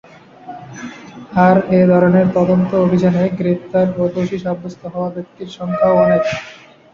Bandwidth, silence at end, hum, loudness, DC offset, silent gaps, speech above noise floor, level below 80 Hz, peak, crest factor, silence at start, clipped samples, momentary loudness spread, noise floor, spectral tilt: 7 kHz; 0.4 s; none; -15 LUFS; under 0.1%; none; 22 dB; -50 dBFS; -2 dBFS; 14 dB; 0.45 s; under 0.1%; 20 LU; -36 dBFS; -8.5 dB/octave